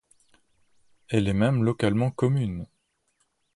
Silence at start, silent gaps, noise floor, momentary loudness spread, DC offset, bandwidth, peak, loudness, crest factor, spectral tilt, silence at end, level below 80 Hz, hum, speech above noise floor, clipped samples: 1.1 s; none; -72 dBFS; 10 LU; under 0.1%; 11.5 kHz; -10 dBFS; -25 LUFS; 18 dB; -7.5 dB/octave; 0.9 s; -50 dBFS; none; 49 dB; under 0.1%